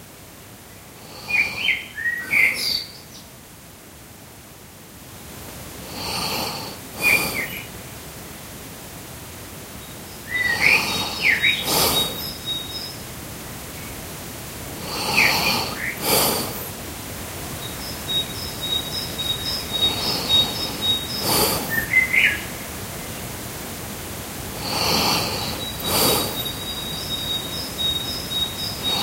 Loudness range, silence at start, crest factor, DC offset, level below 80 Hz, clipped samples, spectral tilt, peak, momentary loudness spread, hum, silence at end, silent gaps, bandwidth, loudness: 7 LU; 0 s; 24 dB; under 0.1%; -44 dBFS; under 0.1%; -2 dB/octave; -2 dBFS; 22 LU; none; 0 s; none; 16 kHz; -21 LUFS